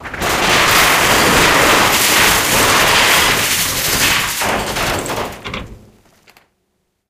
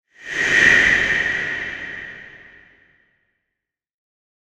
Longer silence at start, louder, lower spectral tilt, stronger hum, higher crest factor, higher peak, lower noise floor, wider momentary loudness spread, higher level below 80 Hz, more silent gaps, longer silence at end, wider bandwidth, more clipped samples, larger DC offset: second, 0 s vs 0.2 s; first, -11 LUFS vs -16 LUFS; about the same, -1.5 dB/octave vs -2 dB/octave; neither; second, 14 dB vs 22 dB; about the same, 0 dBFS vs 0 dBFS; second, -67 dBFS vs -82 dBFS; second, 11 LU vs 21 LU; first, -34 dBFS vs -48 dBFS; neither; second, 1.35 s vs 2.1 s; first, 17 kHz vs 12.5 kHz; neither; neither